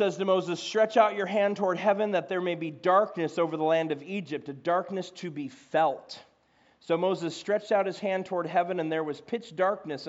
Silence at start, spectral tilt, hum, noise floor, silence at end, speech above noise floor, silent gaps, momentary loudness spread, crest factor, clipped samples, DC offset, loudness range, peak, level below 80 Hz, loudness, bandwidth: 0 s; -4 dB/octave; none; -65 dBFS; 0 s; 37 dB; none; 11 LU; 18 dB; under 0.1%; under 0.1%; 5 LU; -10 dBFS; -82 dBFS; -28 LUFS; 8 kHz